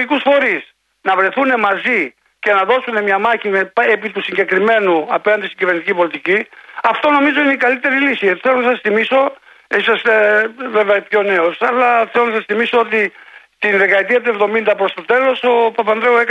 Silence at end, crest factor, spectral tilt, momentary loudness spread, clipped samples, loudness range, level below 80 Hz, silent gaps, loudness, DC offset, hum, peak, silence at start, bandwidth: 0 s; 14 dB; -5.5 dB/octave; 5 LU; under 0.1%; 1 LU; -66 dBFS; none; -14 LUFS; under 0.1%; none; -2 dBFS; 0 s; 9.2 kHz